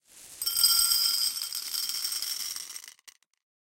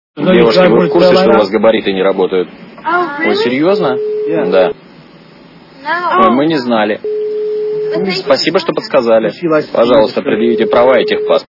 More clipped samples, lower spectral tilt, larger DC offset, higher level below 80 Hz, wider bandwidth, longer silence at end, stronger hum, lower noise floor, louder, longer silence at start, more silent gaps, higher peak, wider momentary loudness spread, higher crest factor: second, under 0.1% vs 0.1%; second, 4 dB/octave vs -6.5 dB/octave; neither; second, -66 dBFS vs -48 dBFS; first, 17 kHz vs 6 kHz; first, 0.6 s vs 0.05 s; neither; first, -52 dBFS vs -38 dBFS; second, -25 LUFS vs -11 LUFS; about the same, 0.15 s vs 0.15 s; neither; second, -8 dBFS vs 0 dBFS; first, 15 LU vs 8 LU; first, 22 dB vs 12 dB